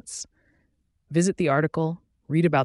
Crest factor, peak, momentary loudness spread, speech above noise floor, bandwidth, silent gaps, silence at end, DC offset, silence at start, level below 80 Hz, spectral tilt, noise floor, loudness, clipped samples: 18 dB; -8 dBFS; 15 LU; 47 dB; 11.5 kHz; none; 0 s; under 0.1%; 0.05 s; -60 dBFS; -6 dB/octave; -69 dBFS; -24 LUFS; under 0.1%